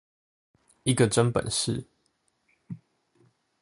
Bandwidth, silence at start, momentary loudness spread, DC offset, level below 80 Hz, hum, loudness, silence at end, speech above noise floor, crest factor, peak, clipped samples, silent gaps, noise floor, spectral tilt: 11.5 kHz; 0.85 s; 22 LU; under 0.1%; -56 dBFS; none; -26 LUFS; 0.85 s; 48 dB; 22 dB; -8 dBFS; under 0.1%; none; -73 dBFS; -4.5 dB/octave